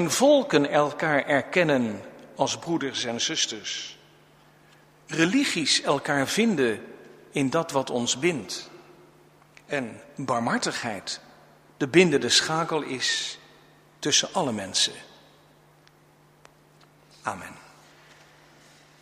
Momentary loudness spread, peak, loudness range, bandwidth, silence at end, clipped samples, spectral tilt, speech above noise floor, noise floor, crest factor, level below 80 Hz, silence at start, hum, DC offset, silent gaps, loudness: 16 LU; -2 dBFS; 8 LU; 15.5 kHz; 1.4 s; under 0.1%; -3 dB/octave; 33 dB; -58 dBFS; 24 dB; -68 dBFS; 0 s; none; under 0.1%; none; -24 LUFS